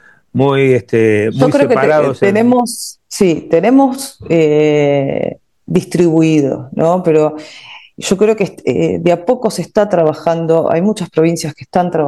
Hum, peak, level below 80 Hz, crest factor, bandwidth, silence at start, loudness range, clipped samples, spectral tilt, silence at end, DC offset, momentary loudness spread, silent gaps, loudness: none; 0 dBFS; -50 dBFS; 12 dB; 12.5 kHz; 0.35 s; 2 LU; under 0.1%; -6.5 dB/octave; 0 s; 0.1%; 9 LU; none; -13 LUFS